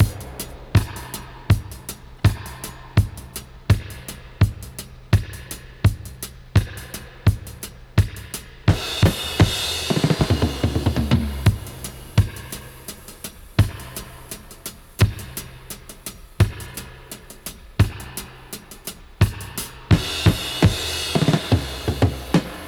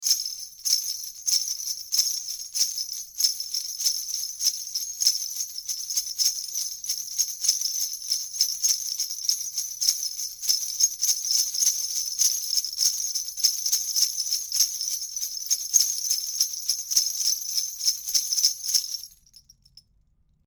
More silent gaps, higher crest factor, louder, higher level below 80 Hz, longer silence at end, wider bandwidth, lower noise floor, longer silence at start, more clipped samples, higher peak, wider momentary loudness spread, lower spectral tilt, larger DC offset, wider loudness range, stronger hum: neither; about the same, 20 dB vs 24 dB; about the same, -22 LUFS vs -24 LUFS; first, -32 dBFS vs -68 dBFS; second, 0 s vs 1.4 s; about the same, over 20 kHz vs over 20 kHz; second, -40 dBFS vs -64 dBFS; about the same, 0 s vs 0 s; neither; about the same, -2 dBFS vs -2 dBFS; first, 16 LU vs 8 LU; first, -5.5 dB/octave vs 6 dB/octave; neither; first, 6 LU vs 3 LU; neither